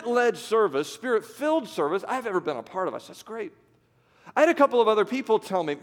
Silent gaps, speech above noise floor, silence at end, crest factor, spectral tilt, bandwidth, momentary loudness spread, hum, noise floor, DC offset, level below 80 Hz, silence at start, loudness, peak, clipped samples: none; 38 dB; 0.05 s; 20 dB; -4.5 dB/octave; 17 kHz; 16 LU; none; -63 dBFS; under 0.1%; -78 dBFS; 0 s; -25 LUFS; -6 dBFS; under 0.1%